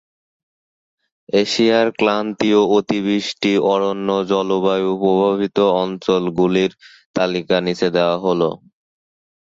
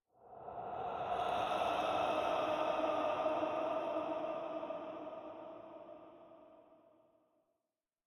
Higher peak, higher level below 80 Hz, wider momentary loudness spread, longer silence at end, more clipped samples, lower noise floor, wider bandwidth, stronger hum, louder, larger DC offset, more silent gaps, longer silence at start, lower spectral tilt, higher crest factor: first, -2 dBFS vs -24 dBFS; first, -58 dBFS vs -72 dBFS; second, 5 LU vs 18 LU; second, 0.9 s vs 1.3 s; neither; about the same, under -90 dBFS vs under -90 dBFS; second, 7.8 kHz vs 14 kHz; neither; first, -17 LUFS vs -38 LUFS; neither; first, 7.05-7.14 s vs none; first, 1.35 s vs 0.2 s; about the same, -5.5 dB/octave vs -5 dB/octave; about the same, 16 dB vs 16 dB